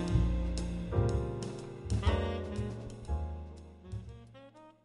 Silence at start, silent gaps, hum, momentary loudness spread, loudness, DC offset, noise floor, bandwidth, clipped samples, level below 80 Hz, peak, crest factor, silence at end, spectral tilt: 0 s; none; none; 20 LU; -36 LUFS; under 0.1%; -55 dBFS; 11.5 kHz; under 0.1%; -38 dBFS; -16 dBFS; 18 dB; 0.15 s; -7 dB/octave